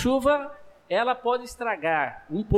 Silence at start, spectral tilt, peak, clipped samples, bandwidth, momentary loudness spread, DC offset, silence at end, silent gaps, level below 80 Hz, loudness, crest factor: 0 s; -5.5 dB/octave; -12 dBFS; under 0.1%; 15.5 kHz; 7 LU; under 0.1%; 0 s; none; -44 dBFS; -26 LUFS; 14 dB